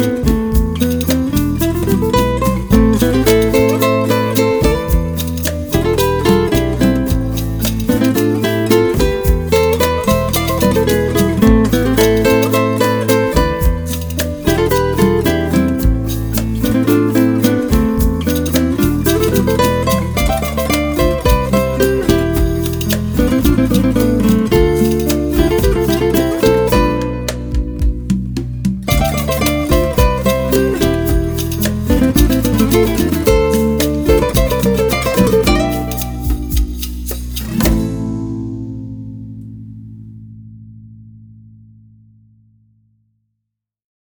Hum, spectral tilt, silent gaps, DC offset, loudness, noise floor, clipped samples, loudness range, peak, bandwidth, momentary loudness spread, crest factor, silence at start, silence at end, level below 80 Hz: none; -6 dB/octave; none; under 0.1%; -14 LUFS; -77 dBFS; under 0.1%; 4 LU; 0 dBFS; over 20 kHz; 8 LU; 14 dB; 0 s; 2.75 s; -22 dBFS